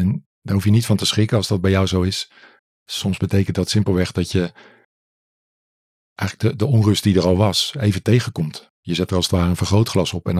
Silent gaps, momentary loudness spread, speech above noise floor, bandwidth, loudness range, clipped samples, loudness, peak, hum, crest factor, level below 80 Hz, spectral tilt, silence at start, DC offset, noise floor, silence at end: 0.26-0.42 s, 2.59-2.86 s, 4.85-6.16 s, 8.70-8.83 s; 10 LU; over 72 dB; 15 kHz; 5 LU; under 0.1%; -19 LUFS; -4 dBFS; none; 16 dB; -52 dBFS; -5.5 dB/octave; 0 s; under 0.1%; under -90 dBFS; 0 s